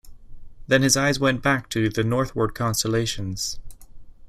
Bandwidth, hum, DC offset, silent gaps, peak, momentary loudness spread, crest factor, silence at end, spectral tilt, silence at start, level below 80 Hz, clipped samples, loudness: 15.5 kHz; none; under 0.1%; none; -4 dBFS; 9 LU; 20 dB; 0 s; -4 dB/octave; 0.05 s; -44 dBFS; under 0.1%; -22 LUFS